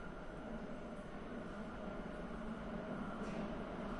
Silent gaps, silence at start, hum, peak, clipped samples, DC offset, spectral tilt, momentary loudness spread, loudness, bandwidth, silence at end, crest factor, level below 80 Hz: none; 0 s; none; -32 dBFS; under 0.1%; under 0.1%; -7 dB/octave; 5 LU; -47 LUFS; 11 kHz; 0 s; 14 dB; -56 dBFS